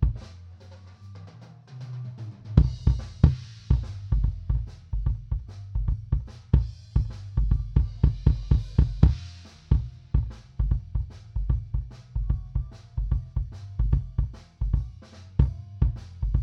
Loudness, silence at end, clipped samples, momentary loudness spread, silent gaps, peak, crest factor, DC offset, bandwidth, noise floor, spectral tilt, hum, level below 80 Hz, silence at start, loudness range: -28 LUFS; 0 s; under 0.1%; 19 LU; none; -2 dBFS; 24 dB; under 0.1%; 6.2 kHz; -46 dBFS; -9 dB/octave; none; -28 dBFS; 0 s; 5 LU